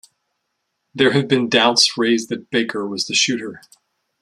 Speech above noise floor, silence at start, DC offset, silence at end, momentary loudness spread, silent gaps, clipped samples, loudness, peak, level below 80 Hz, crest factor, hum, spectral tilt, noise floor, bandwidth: 56 dB; 0.95 s; under 0.1%; 0.65 s; 10 LU; none; under 0.1%; -17 LUFS; 0 dBFS; -64 dBFS; 20 dB; none; -3 dB/octave; -74 dBFS; 13 kHz